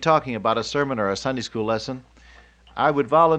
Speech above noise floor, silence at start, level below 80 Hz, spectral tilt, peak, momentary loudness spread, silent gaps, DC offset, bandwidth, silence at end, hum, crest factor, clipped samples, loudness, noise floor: 29 dB; 0 s; -52 dBFS; -5.5 dB/octave; -4 dBFS; 11 LU; none; under 0.1%; 9 kHz; 0 s; none; 18 dB; under 0.1%; -23 LUFS; -50 dBFS